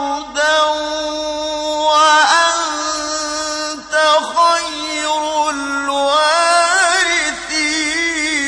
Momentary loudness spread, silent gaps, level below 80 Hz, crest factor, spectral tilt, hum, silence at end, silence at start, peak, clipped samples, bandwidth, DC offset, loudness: 9 LU; none; -50 dBFS; 14 dB; 0.5 dB/octave; none; 0 s; 0 s; 0 dBFS; under 0.1%; 11 kHz; under 0.1%; -15 LUFS